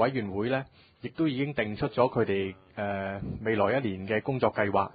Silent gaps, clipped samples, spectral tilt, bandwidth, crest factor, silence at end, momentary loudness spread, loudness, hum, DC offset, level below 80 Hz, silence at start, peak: none; under 0.1%; -11 dB/octave; 5 kHz; 20 dB; 0.05 s; 9 LU; -29 LUFS; none; under 0.1%; -54 dBFS; 0 s; -10 dBFS